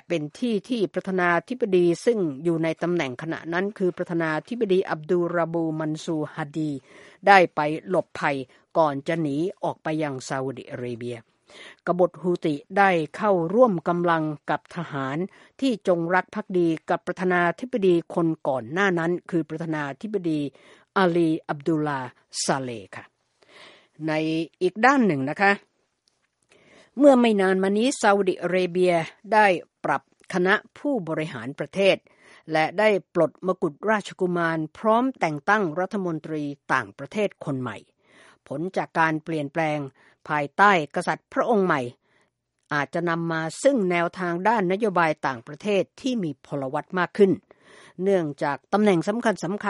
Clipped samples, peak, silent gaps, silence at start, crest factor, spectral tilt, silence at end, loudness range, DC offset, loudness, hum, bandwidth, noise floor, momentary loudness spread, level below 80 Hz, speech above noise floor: under 0.1%; 0 dBFS; none; 0.1 s; 24 dB; -6 dB/octave; 0 s; 5 LU; under 0.1%; -24 LUFS; none; 11.5 kHz; -71 dBFS; 10 LU; -70 dBFS; 47 dB